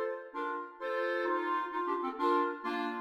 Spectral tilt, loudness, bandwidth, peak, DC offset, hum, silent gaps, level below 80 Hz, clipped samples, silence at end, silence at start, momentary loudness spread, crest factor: -4.5 dB/octave; -34 LUFS; 12.5 kHz; -20 dBFS; under 0.1%; none; none; -80 dBFS; under 0.1%; 0 s; 0 s; 8 LU; 14 dB